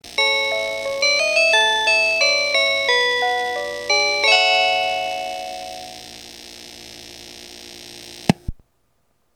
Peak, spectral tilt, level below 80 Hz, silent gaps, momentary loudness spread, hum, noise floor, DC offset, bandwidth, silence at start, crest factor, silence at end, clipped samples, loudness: 0 dBFS; -2 dB/octave; -46 dBFS; none; 22 LU; 60 Hz at -55 dBFS; -67 dBFS; under 0.1%; 19 kHz; 0.05 s; 20 dB; 0.85 s; under 0.1%; -17 LUFS